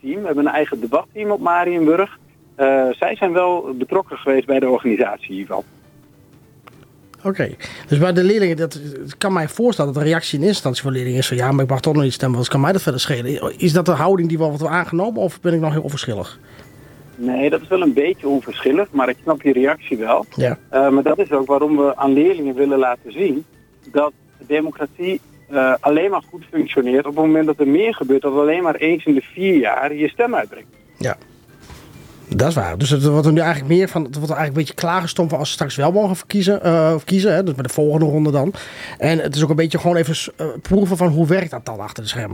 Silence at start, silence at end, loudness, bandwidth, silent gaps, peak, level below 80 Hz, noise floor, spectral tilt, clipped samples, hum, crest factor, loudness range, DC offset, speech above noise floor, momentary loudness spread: 0.05 s; 0 s; -18 LUFS; 19 kHz; none; -4 dBFS; -52 dBFS; -48 dBFS; -6.5 dB/octave; under 0.1%; none; 14 dB; 4 LU; under 0.1%; 31 dB; 9 LU